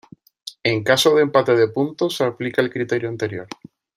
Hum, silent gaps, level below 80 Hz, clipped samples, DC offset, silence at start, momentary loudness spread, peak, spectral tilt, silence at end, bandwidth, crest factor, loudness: none; none; -62 dBFS; under 0.1%; under 0.1%; 0.45 s; 20 LU; -2 dBFS; -4.5 dB/octave; 0.5 s; 15.5 kHz; 18 dB; -19 LUFS